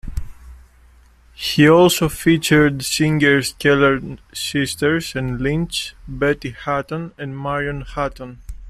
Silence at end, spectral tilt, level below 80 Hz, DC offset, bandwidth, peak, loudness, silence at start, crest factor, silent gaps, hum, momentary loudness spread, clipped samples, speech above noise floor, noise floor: 0 s; -5 dB/octave; -38 dBFS; under 0.1%; 15.5 kHz; -2 dBFS; -18 LUFS; 0.05 s; 16 dB; none; none; 15 LU; under 0.1%; 31 dB; -49 dBFS